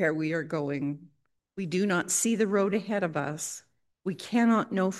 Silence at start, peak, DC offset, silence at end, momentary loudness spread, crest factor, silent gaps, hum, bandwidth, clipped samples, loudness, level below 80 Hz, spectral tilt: 0 s; -14 dBFS; under 0.1%; 0 s; 13 LU; 16 dB; none; none; 12.5 kHz; under 0.1%; -28 LUFS; -76 dBFS; -4.5 dB/octave